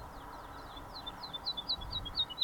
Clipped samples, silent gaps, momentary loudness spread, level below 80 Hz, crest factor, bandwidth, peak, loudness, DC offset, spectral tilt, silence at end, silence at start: under 0.1%; none; 13 LU; -52 dBFS; 20 dB; 18 kHz; -20 dBFS; -39 LUFS; under 0.1%; -3.5 dB/octave; 0 s; 0 s